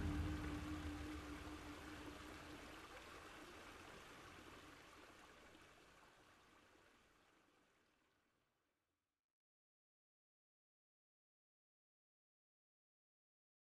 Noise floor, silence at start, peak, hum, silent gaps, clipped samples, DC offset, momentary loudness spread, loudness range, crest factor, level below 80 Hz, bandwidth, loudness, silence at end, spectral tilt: under -90 dBFS; 0 s; -34 dBFS; none; none; under 0.1%; under 0.1%; 19 LU; 14 LU; 22 dB; -62 dBFS; 13 kHz; -54 LUFS; 6 s; -5.5 dB/octave